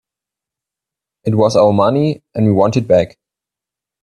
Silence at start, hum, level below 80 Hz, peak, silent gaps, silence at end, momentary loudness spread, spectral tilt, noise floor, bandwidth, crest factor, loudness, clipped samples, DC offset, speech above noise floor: 1.25 s; none; -52 dBFS; 0 dBFS; none; 0.95 s; 8 LU; -7.5 dB/octave; -86 dBFS; 10.5 kHz; 16 dB; -14 LUFS; under 0.1%; under 0.1%; 73 dB